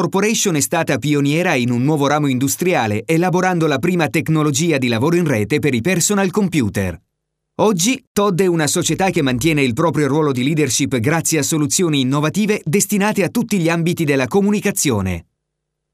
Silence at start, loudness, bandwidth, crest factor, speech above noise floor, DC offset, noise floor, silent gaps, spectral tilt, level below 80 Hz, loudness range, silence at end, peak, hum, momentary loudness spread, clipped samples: 0 s; -16 LUFS; 16 kHz; 14 dB; 60 dB; under 0.1%; -76 dBFS; 8.07-8.15 s; -4.5 dB/octave; -50 dBFS; 1 LU; 0.7 s; -2 dBFS; none; 2 LU; under 0.1%